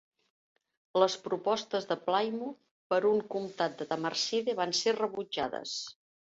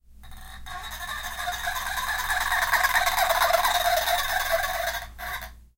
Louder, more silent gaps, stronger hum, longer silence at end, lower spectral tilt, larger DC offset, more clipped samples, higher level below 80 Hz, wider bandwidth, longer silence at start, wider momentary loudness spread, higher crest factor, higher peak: second, -32 LUFS vs -25 LUFS; first, 2.71-2.90 s vs none; neither; first, 0.4 s vs 0.1 s; first, -3 dB/octave vs 0 dB/octave; neither; neither; second, -76 dBFS vs -42 dBFS; second, 8 kHz vs 17 kHz; first, 0.95 s vs 0.1 s; second, 9 LU vs 15 LU; about the same, 20 dB vs 18 dB; second, -12 dBFS vs -8 dBFS